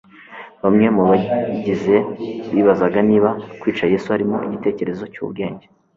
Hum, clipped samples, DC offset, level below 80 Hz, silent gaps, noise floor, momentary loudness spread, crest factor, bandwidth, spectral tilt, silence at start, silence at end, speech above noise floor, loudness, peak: none; under 0.1%; under 0.1%; -54 dBFS; none; -39 dBFS; 13 LU; 16 dB; 7.2 kHz; -8.5 dB/octave; 0.3 s; 0.4 s; 21 dB; -18 LUFS; -2 dBFS